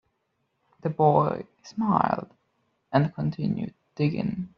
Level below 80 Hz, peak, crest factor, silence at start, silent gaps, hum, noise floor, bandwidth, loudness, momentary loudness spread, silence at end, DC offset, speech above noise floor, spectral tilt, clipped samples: -62 dBFS; -6 dBFS; 22 dB; 0.85 s; none; none; -75 dBFS; 6.6 kHz; -26 LUFS; 13 LU; 0.1 s; under 0.1%; 50 dB; -7.5 dB/octave; under 0.1%